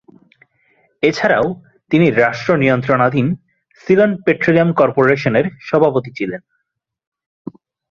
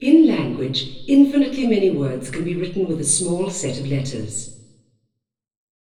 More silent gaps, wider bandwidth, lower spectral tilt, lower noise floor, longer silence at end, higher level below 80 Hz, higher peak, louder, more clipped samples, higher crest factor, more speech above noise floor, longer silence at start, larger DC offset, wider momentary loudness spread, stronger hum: neither; second, 7.4 kHz vs 11.5 kHz; first, -7.5 dB/octave vs -5 dB/octave; about the same, -75 dBFS vs -74 dBFS; first, 1.55 s vs 1.4 s; about the same, -54 dBFS vs -50 dBFS; about the same, -2 dBFS vs -2 dBFS; first, -15 LUFS vs -20 LUFS; neither; about the same, 16 dB vs 18 dB; first, 60 dB vs 54 dB; first, 1 s vs 0 s; second, under 0.1% vs 0.4%; first, 19 LU vs 12 LU; neither